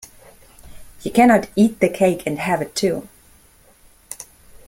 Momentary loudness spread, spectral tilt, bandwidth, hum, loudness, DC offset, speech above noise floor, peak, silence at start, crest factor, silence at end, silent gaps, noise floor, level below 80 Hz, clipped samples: 21 LU; -5.5 dB/octave; 16.5 kHz; none; -18 LUFS; under 0.1%; 35 dB; -2 dBFS; 0.65 s; 20 dB; 0.45 s; none; -52 dBFS; -50 dBFS; under 0.1%